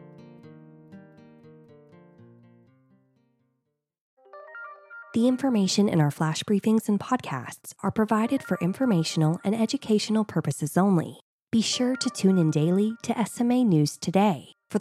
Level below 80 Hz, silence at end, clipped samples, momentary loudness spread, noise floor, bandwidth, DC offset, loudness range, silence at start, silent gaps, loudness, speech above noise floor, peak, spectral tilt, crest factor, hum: -70 dBFS; 0 s; under 0.1%; 12 LU; -79 dBFS; 14 kHz; under 0.1%; 3 LU; 0 s; 4.01-4.17 s, 11.21-11.47 s; -25 LUFS; 55 dB; -8 dBFS; -6 dB/octave; 18 dB; none